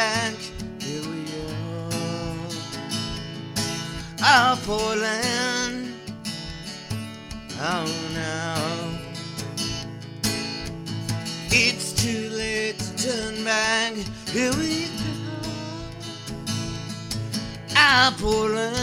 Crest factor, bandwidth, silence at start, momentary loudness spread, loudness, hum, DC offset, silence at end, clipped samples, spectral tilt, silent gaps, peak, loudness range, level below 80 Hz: 22 dB; 16.5 kHz; 0 s; 15 LU; -24 LUFS; none; under 0.1%; 0 s; under 0.1%; -3 dB/octave; none; -4 dBFS; 7 LU; -46 dBFS